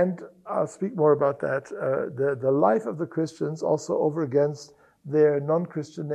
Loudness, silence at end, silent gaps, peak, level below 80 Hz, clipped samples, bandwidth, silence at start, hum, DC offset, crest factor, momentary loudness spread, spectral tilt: -25 LUFS; 0 s; none; -6 dBFS; -72 dBFS; under 0.1%; 9.6 kHz; 0 s; none; under 0.1%; 18 dB; 8 LU; -7.5 dB/octave